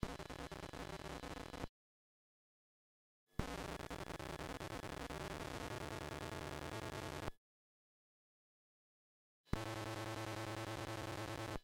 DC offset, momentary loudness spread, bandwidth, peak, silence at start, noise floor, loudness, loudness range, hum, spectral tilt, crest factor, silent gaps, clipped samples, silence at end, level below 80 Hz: under 0.1%; 5 LU; 18 kHz; -20 dBFS; 0 s; under -90 dBFS; -47 LUFS; 4 LU; none; -5 dB/octave; 28 dB; 1.69-3.27 s, 7.37-9.44 s; under 0.1%; 0 s; -60 dBFS